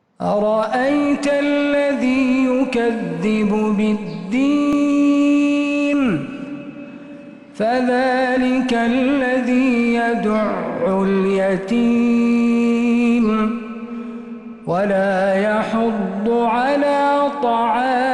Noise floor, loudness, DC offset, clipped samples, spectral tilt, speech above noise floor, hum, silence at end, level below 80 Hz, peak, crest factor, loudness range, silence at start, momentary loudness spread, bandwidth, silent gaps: -37 dBFS; -17 LUFS; under 0.1%; under 0.1%; -6.5 dB/octave; 20 dB; none; 0 s; -52 dBFS; -8 dBFS; 10 dB; 2 LU; 0.2 s; 13 LU; 10.5 kHz; none